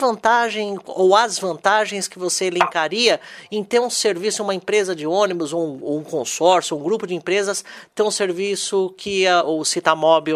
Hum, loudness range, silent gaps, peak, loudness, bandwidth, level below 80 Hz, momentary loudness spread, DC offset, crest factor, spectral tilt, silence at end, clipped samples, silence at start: none; 2 LU; none; 0 dBFS; -19 LUFS; 14.5 kHz; -68 dBFS; 8 LU; under 0.1%; 20 dB; -2.5 dB/octave; 0 s; under 0.1%; 0 s